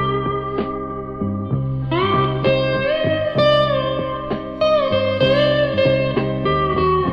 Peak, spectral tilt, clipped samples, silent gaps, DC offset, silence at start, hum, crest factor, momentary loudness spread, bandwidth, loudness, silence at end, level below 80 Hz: -2 dBFS; -8 dB/octave; under 0.1%; none; under 0.1%; 0 s; none; 16 dB; 9 LU; 6.4 kHz; -19 LUFS; 0 s; -38 dBFS